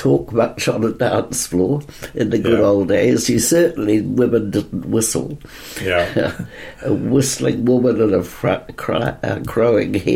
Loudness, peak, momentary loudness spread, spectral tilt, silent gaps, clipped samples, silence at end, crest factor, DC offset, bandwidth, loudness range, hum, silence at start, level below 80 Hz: -17 LUFS; -4 dBFS; 9 LU; -5 dB/octave; none; under 0.1%; 0 s; 12 dB; under 0.1%; 16.5 kHz; 3 LU; none; 0 s; -44 dBFS